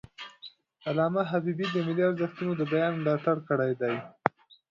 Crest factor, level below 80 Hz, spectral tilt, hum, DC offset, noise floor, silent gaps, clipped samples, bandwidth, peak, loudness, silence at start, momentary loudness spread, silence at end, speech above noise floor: 26 dB; -70 dBFS; -8 dB/octave; none; under 0.1%; -52 dBFS; none; under 0.1%; 7.4 kHz; -2 dBFS; -29 LUFS; 0.2 s; 15 LU; 0.4 s; 24 dB